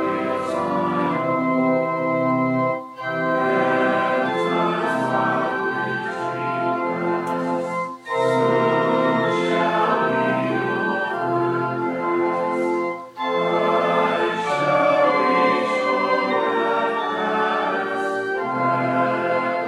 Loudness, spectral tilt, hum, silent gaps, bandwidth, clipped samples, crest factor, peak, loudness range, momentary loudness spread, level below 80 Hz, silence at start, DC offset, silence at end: -21 LUFS; -6.5 dB/octave; none; none; 12.5 kHz; under 0.1%; 14 dB; -6 dBFS; 3 LU; 6 LU; -74 dBFS; 0 s; under 0.1%; 0 s